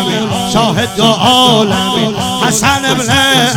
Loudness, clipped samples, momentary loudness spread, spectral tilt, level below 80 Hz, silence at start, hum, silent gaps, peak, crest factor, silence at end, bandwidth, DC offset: -10 LUFS; under 0.1%; 6 LU; -3.5 dB/octave; -40 dBFS; 0 s; none; none; 0 dBFS; 10 dB; 0 s; 18.5 kHz; under 0.1%